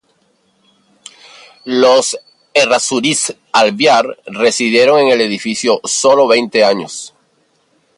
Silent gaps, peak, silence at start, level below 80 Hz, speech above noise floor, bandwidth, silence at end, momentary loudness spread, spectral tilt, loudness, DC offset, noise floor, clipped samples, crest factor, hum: none; 0 dBFS; 1.65 s; -64 dBFS; 46 dB; 11.5 kHz; 0.9 s; 11 LU; -2.5 dB/octave; -12 LUFS; under 0.1%; -58 dBFS; under 0.1%; 14 dB; none